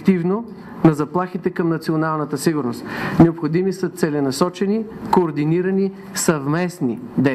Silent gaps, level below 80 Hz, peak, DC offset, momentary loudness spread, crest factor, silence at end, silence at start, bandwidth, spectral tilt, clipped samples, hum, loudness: none; -50 dBFS; -4 dBFS; under 0.1%; 8 LU; 16 dB; 0 s; 0 s; 13 kHz; -6.5 dB/octave; under 0.1%; none; -20 LUFS